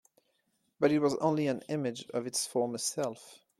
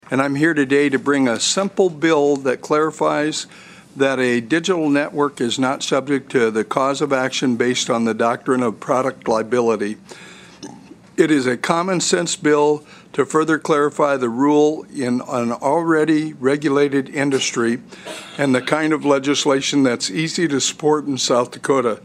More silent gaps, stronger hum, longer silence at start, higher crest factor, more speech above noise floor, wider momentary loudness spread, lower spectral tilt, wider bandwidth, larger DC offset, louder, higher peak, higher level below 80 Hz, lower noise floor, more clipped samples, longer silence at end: neither; neither; first, 0.8 s vs 0.1 s; about the same, 20 dB vs 18 dB; first, 45 dB vs 22 dB; first, 9 LU vs 6 LU; about the same, -4.5 dB/octave vs -4 dB/octave; about the same, 14.5 kHz vs 13.5 kHz; neither; second, -32 LUFS vs -18 LUFS; second, -14 dBFS vs 0 dBFS; second, -76 dBFS vs -66 dBFS; first, -77 dBFS vs -40 dBFS; neither; first, 0.25 s vs 0.05 s